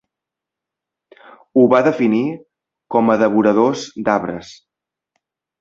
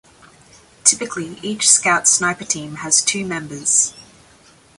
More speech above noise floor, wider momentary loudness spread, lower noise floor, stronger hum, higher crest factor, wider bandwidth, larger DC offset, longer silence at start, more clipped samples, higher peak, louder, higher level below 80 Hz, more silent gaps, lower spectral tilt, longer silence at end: first, 69 dB vs 31 dB; about the same, 12 LU vs 13 LU; first, -85 dBFS vs -50 dBFS; neither; about the same, 18 dB vs 20 dB; second, 7.6 kHz vs 16 kHz; neither; first, 1.55 s vs 0.85 s; neither; about the same, -2 dBFS vs 0 dBFS; about the same, -16 LUFS vs -16 LUFS; about the same, -60 dBFS vs -58 dBFS; neither; first, -6.5 dB/octave vs -1 dB/octave; first, 1.05 s vs 0.75 s